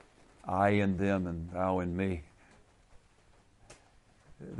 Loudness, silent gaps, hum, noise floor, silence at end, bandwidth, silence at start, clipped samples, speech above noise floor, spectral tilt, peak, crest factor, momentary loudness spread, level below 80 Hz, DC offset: -32 LUFS; none; none; -63 dBFS; 0 s; 11 kHz; 0.45 s; under 0.1%; 33 dB; -8 dB/octave; -14 dBFS; 20 dB; 14 LU; -56 dBFS; under 0.1%